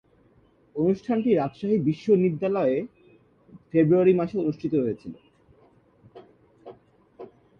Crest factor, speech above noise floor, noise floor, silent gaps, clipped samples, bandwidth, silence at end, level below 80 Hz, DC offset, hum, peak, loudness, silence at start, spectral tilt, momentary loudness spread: 18 dB; 37 dB; -60 dBFS; none; under 0.1%; 6.8 kHz; 0.35 s; -64 dBFS; under 0.1%; none; -8 dBFS; -24 LUFS; 0.75 s; -9.5 dB/octave; 11 LU